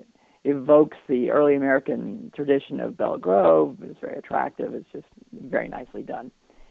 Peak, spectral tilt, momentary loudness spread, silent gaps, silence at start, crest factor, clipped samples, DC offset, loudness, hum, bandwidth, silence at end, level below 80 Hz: -4 dBFS; -9 dB/octave; 18 LU; none; 0.45 s; 20 dB; under 0.1%; under 0.1%; -22 LUFS; none; 4.6 kHz; 0.4 s; -62 dBFS